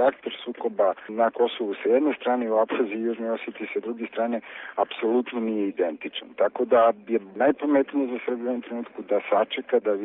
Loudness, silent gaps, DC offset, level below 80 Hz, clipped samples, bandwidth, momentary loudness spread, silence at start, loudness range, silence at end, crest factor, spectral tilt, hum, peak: -25 LUFS; none; under 0.1%; -74 dBFS; under 0.1%; 4 kHz; 9 LU; 0 s; 4 LU; 0 s; 16 dB; -3 dB/octave; none; -8 dBFS